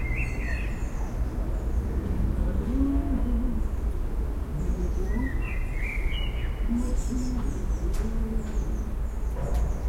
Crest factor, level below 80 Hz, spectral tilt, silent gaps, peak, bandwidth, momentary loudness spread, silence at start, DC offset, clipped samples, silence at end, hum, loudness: 14 dB; -28 dBFS; -7 dB/octave; none; -14 dBFS; 13.5 kHz; 4 LU; 0 s; under 0.1%; under 0.1%; 0 s; none; -30 LUFS